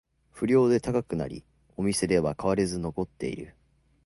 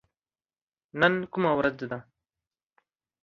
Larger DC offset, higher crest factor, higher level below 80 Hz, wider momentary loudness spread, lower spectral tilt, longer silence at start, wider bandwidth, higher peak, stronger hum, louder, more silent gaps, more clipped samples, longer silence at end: neither; second, 18 dB vs 26 dB; first, -52 dBFS vs -64 dBFS; about the same, 17 LU vs 15 LU; second, -6 dB/octave vs -7.5 dB/octave; second, 0.35 s vs 0.95 s; first, 11.5 kHz vs 7.2 kHz; second, -10 dBFS vs -6 dBFS; neither; about the same, -27 LUFS vs -26 LUFS; neither; neither; second, 0.55 s vs 1.2 s